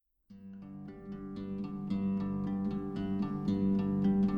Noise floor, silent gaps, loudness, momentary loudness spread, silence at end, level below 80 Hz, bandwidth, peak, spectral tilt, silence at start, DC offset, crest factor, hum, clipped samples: -54 dBFS; none; -34 LUFS; 17 LU; 0 s; -56 dBFS; 5.2 kHz; -20 dBFS; -10 dB/octave; 0.3 s; under 0.1%; 14 dB; none; under 0.1%